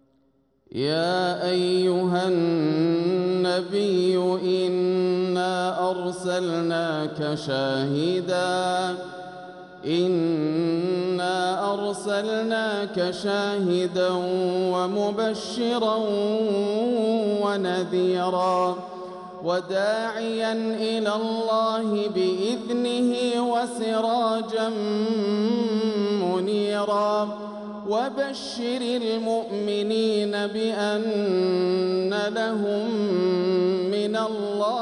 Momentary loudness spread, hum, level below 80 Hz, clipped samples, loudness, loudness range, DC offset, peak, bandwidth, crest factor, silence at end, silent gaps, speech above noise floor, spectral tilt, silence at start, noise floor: 5 LU; none; -70 dBFS; under 0.1%; -24 LUFS; 3 LU; under 0.1%; -10 dBFS; 11.5 kHz; 14 dB; 0 s; none; 41 dB; -5.5 dB/octave; 0.75 s; -65 dBFS